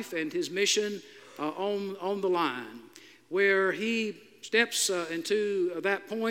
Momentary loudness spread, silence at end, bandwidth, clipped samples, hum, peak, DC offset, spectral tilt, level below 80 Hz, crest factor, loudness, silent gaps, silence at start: 12 LU; 0 s; 16.5 kHz; under 0.1%; none; -10 dBFS; under 0.1%; -2.5 dB/octave; -88 dBFS; 20 dB; -29 LUFS; none; 0 s